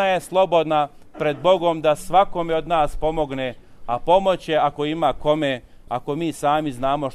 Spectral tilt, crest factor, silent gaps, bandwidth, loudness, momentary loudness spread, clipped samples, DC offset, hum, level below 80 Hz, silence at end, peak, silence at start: -5.5 dB/octave; 16 dB; none; 14 kHz; -21 LUFS; 10 LU; under 0.1%; under 0.1%; none; -40 dBFS; 0 s; -4 dBFS; 0 s